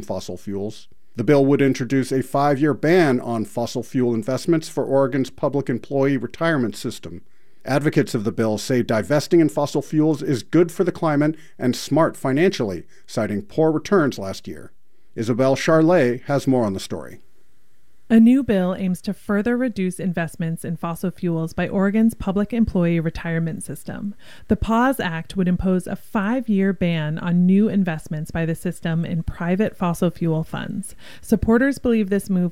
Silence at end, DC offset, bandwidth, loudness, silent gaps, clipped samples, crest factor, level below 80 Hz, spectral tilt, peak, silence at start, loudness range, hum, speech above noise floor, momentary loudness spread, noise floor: 0 s; 1%; 16 kHz; -21 LUFS; none; under 0.1%; 16 dB; -44 dBFS; -7 dB/octave; -4 dBFS; 0 s; 3 LU; none; 44 dB; 12 LU; -64 dBFS